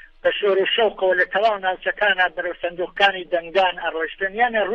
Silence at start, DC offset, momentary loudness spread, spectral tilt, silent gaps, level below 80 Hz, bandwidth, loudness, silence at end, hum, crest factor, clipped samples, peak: 0.25 s; under 0.1%; 7 LU; -4.5 dB/octave; none; -52 dBFS; 7.6 kHz; -20 LUFS; 0 s; none; 16 dB; under 0.1%; -4 dBFS